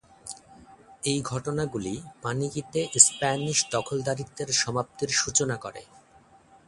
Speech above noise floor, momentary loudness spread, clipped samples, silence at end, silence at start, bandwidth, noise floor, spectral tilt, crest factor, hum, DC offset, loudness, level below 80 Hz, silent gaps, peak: 30 dB; 21 LU; under 0.1%; 0.85 s; 0.25 s; 11.5 kHz; -57 dBFS; -2.5 dB/octave; 28 dB; none; under 0.1%; -25 LUFS; -58 dBFS; none; 0 dBFS